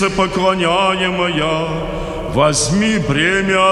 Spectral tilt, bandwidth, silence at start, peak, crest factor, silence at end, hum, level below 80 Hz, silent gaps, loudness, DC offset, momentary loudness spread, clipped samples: -4 dB/octave; 12.5 kHz; 0 s; -2 dBFS; 14 dB; 0 s; none; -34 dBFS; none; -15 LUFS; under 0.1%; 7 LU; under 0.1%